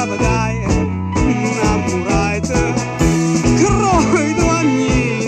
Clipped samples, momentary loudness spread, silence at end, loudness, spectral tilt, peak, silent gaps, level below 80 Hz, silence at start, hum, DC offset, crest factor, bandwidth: under 0.1%; 4 LU; 0 s; -15 LUFS; -5.5 dB/octave; -2 dBFS; none; -26 dBFS; 0 s; none; under 0.1%; 14 dB; 13 kHz